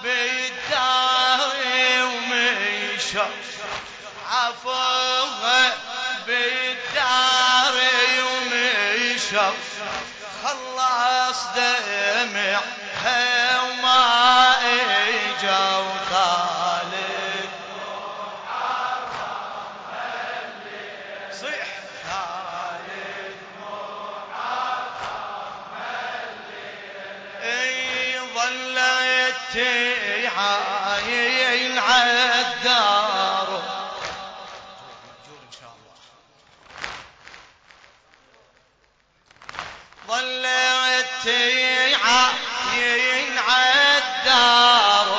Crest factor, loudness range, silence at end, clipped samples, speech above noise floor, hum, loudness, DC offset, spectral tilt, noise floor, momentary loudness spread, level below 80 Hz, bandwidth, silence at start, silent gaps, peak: 18 dB; 14 LU; 0 s; under 0.1%; 40 dB; none; -19 LUFS; under 0.1%; -0.5 dB/octave; -62 dBFS; 18 LU; -62 dBFS; 9.8 kHz; 0 s; none; -4 dBFS